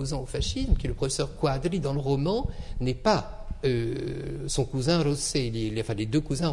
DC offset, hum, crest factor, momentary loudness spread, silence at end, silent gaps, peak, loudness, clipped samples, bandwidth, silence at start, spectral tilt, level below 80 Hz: under 0.1%; none; 18 dB; 7 LU; 0 s; none; -8 dBFS; -28 LUFS; under 0.1%; 12 kHz; 0 s; -5.5 dB/octave; -36 dBFS